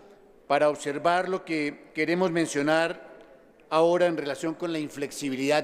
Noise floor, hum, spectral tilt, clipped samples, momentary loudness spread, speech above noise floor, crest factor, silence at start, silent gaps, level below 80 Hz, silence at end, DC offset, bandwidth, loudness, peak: -54 dBFS; none; -4.5 dB/octave; under 0.1%; 8 LU; 28 dB; 18 dB; 0.5 s; none; -70 dBFS; 0 s; under 0.1%; 15.5 kHz; -26 LUFS; -8 dBFS